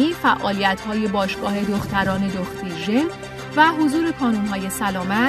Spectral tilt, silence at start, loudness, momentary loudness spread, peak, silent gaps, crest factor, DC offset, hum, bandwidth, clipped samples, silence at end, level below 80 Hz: -5 dB/octave; 0 s; -21 LUFS; 9 LU; -2 dBFS; none; 18 dB; under 0.1%; none; 14 kHz; under 0.1%; 0 s; -46 dBFS